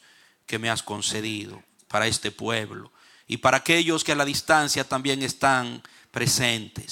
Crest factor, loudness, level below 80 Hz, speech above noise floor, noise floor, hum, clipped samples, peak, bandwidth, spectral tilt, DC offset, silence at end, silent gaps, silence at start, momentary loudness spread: 22 dB; -24 LUFS; -58 dBFS; 26 dB; -50 dBFS; none; under 0.1%; -4 dBFS; 17.5 kHz; -3 dB/octave; under 0.1%; 0 s; none; 0.5 s; 14 LU